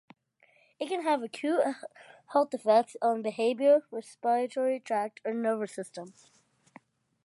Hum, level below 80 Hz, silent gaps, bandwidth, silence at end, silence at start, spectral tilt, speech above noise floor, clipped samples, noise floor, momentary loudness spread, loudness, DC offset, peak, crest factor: none; -88 dBFS; none; 11.5 kHz; 1.15 s; 0.8 s; -4.5 dB/octave; 37 dB; under 0.1%; -66 dBFS; 16 LU; -29 LUFS; under 0.1%; -12 dBFS; 18 dB